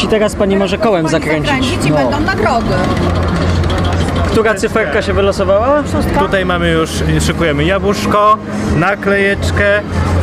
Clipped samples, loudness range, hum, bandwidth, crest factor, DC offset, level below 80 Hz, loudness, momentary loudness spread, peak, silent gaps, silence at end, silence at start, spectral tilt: under 0.1%; 1 LU; none; 15 kHz; 10 dB; under 0.1%; -24 dBFS; -13 LUFS; 3 LU; -2 dBFS; none; 0 s; 0 s; -6 dB/octave